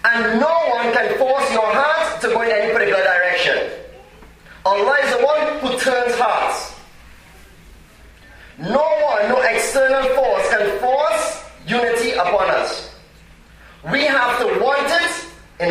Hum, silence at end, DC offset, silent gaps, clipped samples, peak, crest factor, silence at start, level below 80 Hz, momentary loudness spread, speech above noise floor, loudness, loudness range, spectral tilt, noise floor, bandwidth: none; 0 s; under 0.1%; none; under 0.1%; -2 dBFS; 16 dB; 0.05 s; -48 dBFS; 9 LU; 28 dB; -17 LUFS; 5 LU; -3 dB/octave; -45 dBFS; 15.5 kHz